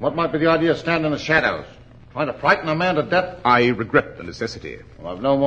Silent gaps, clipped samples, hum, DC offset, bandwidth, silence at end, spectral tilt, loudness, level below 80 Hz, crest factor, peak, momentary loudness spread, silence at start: none; under 0.1%; none; under 0.1%; 8.6 kHz; 0 s; -6 dB/octave; -20 LUFS; -48 dBFS; 20 dB; -2 dBFS; 17 LU; 0 s